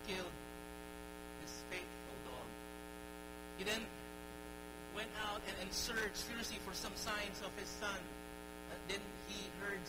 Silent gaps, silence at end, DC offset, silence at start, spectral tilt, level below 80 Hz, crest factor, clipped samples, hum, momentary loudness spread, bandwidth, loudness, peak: none; 0 s; under 0.1%; 0 s; -2.5 dB/octave; -60 dBFS; 22 dB; under 0.1%; none; 10 LU; 16 kHz; -45 LUFS; -24 dBFS